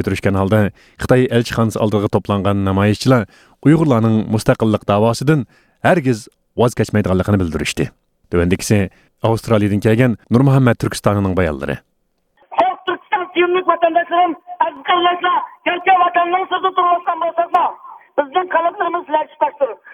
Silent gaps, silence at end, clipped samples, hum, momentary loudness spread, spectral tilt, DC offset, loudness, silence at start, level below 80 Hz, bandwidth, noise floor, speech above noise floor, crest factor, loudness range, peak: none; 0.2 s; under 0.1%; none; 8 LU; -6.5 dB/octave; under 0.1%; -16 LUFS; 0 s; -42 dBFS; 15.5 kHz; -64 dBFS; 49 dB; 16 dB; 3 LU; 0 dBFS